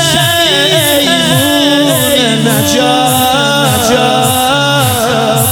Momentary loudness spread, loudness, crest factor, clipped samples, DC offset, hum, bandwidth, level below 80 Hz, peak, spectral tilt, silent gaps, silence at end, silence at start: 2 LU; -8 LUFS; 10 dB; under 0.1%; under 0.1%; none; 18.5 kHz; -40 dBFS; 0 dBFS; -3.5 dB/octave; none; 0 s; 0 s